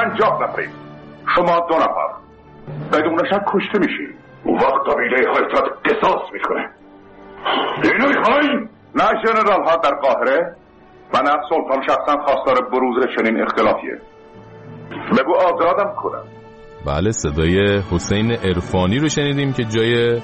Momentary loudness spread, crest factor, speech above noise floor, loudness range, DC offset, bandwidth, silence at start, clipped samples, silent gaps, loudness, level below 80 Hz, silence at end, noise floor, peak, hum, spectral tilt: 12 LU; 14 dB; 28 dB; 3 LU; under 0.1%; 8.4 kHz; 0 s; under 0.1%; none; -17 LUFS; -42 dBFS; 0 s; -45 dBFS; -4 dBFS; none; -5.5 dB/octave